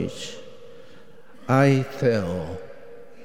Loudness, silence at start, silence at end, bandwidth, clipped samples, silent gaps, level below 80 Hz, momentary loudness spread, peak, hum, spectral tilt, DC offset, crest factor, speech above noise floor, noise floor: -23 LUFS; 0 s; 0.2 s; 12.5 kHz; under 0.1%; none; -56 dBFS; 25 LU; -4 dBFS; none; -7 dB/octave; 0.9%; 22 dB; 28 dB; -50 dBFS